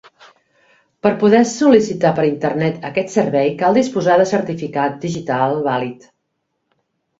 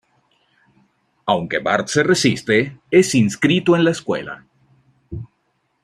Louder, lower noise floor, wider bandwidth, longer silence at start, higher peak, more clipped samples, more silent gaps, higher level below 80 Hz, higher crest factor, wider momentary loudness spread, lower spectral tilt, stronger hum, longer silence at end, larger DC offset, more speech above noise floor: about the same, -16 LUFS vs -17 LUFS; first, -72 dBFS vs -68 dBFS; second, 8 kHz vs 14 kHz; second, 1.05 s vs 1.25 s; about the same, 0 dBFS vs -2 dBFS; neither; neither; about the same, -58 dBFS vs -54 dBFS; about the same, 16 dB vs 18 dB; second, 8 LU vs 19 LU; about the same, -6 dB/octave vs -5 dB/octave; neither; first, 1.25 s vs 0.6 s; neither; first, 56 dB vs 51 dB